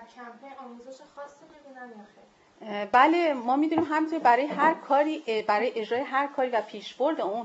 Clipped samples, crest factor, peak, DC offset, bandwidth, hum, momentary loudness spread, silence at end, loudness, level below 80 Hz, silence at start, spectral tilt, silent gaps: under 0.1%; 20 dB; -6 dBFS; under 0.1%; 8 kHz; none; 23 LU; 0 s; -25 LUFS; -76 dBFS; 0 s; -5 dB/octave; none